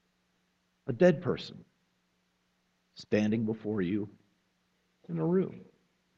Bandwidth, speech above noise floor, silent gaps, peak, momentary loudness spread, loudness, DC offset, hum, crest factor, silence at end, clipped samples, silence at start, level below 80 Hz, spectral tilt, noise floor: 7.6 kHz; 45 dB; none; -10 dBFS; 18 LU; -31 LUFS; under 0.1%; 60 Hz at -60 dBFS; 22 dB; 0.55 s; under 0.1%; 0.85 s; -68 dBFS; -8 dB/octave; -75 dBFS